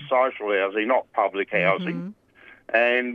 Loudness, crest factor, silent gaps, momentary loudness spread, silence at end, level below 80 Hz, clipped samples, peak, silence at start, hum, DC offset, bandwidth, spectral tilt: -23 LUFS; 18 dB; none; 9 LU; 0 s; -74 dBFS; under 0.1%; -6 dBFS; 0 s; none; under 0.1%; 6.2 kHz; -7.5 dB/octave